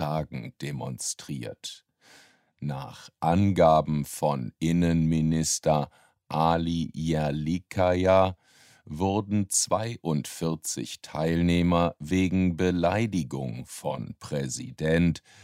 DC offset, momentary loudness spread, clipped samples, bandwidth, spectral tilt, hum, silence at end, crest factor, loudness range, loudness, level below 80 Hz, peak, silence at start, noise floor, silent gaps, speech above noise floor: under 0.1%; 13 LU; under 0.1%; 16 kHz; -5.5 dB/octave; none; 0.25 s; 18 dB; 3 LU; -27 LUFS; -48 dBFS; -8 dBFS; 0 s; -58 dBFS; none; 32 dB